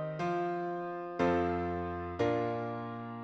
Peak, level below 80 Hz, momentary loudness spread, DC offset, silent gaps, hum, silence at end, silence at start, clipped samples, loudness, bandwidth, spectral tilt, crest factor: -16 dBFS; -58 dBFS; 8 LU; under 0.1%; none; none; 0 s; 0 s; under 0.1%; -34 LUFS; 7.8 kHz; -7.5 dB/octave; 18 dB